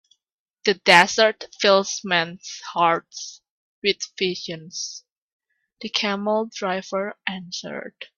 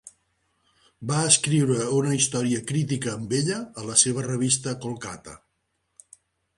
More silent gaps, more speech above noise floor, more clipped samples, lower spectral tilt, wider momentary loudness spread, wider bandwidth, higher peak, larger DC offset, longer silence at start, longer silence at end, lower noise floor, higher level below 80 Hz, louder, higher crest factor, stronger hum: first, 3.50-3.82 s, 5.12-5.16 s, 5.22-5.39 s vs none; first, 58 dB vs 51 dB; neither; second, -2.5 dB/octave vs -4 dB/octave; first, 19 LU vs 14 LU; first, 13.5 kHz vs 11.5 kHz; about the same, 0 dBFS vs -2 dBFS; neither; first, 0.65 s vs 0.05 s; second, 0.15 s vs 1.2 s; first, -81 dBFS vs -75 dBFS; second, -68 dBFS vs -62 dBFS; about the same, -21 LUFS vs -23 LUFS; about the same, 24 dB vs 24 dB; neither